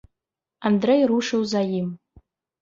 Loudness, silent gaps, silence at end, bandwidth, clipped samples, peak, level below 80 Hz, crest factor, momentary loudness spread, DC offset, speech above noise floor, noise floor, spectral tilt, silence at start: -22 LUFS; none; 0.65 s; 7.6 kHz; under 0.1%; -8 dBFS; -62 dBFS; 16 dB; 11 LU; under 0.1%; 65 dB; -85 dBFS; -6 dB/octave; 0.6 s